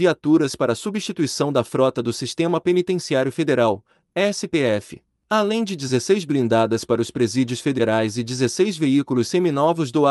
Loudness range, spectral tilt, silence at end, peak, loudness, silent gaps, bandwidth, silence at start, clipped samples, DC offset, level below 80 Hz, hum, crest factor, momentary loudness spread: 1 LU; -5.5 dB/octave; 0 s; -4 dBFS; -21 LUFS; none; 12 kHz; 0 s; under 0.1%; under 0.1%; -62 dBFS; none; 16 dB; 5 LU